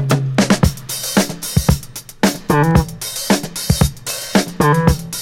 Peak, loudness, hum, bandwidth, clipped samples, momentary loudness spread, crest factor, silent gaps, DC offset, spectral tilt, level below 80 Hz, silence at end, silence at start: 0 dBFS; -16 LUFS; none; 17 kHz; under 0.1%; 9 LU; 16 dB; none; under 0.1%; -5 dB/octave; -28 dBFS; 0 s; 0 s